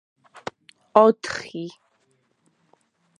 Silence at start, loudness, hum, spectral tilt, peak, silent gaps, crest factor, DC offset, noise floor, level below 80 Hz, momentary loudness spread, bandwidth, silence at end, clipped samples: 0.95 s; -20 LUFS; none; -5 dB/octave; 0 dBFS; none; 24 dB; under 0.1%; -67 dBFS; -68 dBFS; 21 LU; 11 kHz; 1.5 s; under 0.1%